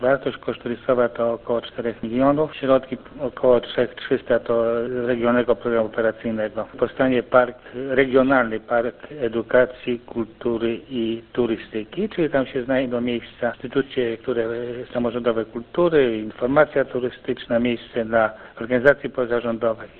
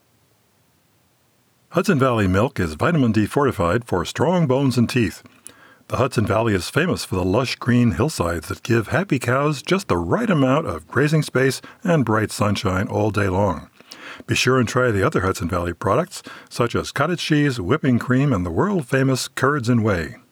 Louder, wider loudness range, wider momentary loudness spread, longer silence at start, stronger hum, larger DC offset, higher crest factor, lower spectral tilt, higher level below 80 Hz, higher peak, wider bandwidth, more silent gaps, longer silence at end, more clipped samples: about the same, -22 LUFS vs -20 LUFS; about the same, 3 LU vs 2 LU; first, 9 LU vs 6 LU; second, 0 s vs 1.7 s; neither; neither; first, 22 dB vs 16 dB; first, -9 dB/octave vs -6 dB/octave; about the same, -50 dBFS vs -46 dBFS; first, 0 dBFS vs -4 dBFS; second, 4.4 kHz vs 18.5 kHz; neither; about the same, 0.1 s vs 0.15 s; neither